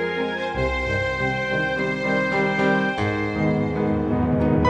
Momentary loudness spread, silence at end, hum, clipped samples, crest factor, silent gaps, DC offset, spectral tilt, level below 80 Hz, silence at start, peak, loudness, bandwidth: 4 LU; 0 s; none; under 0.1%; 16 dB; none; under 0.1%; -7 dB/octave; -38 dBFS; 0 s; -6 dBFS; -22 LUFS; 9.6 kHz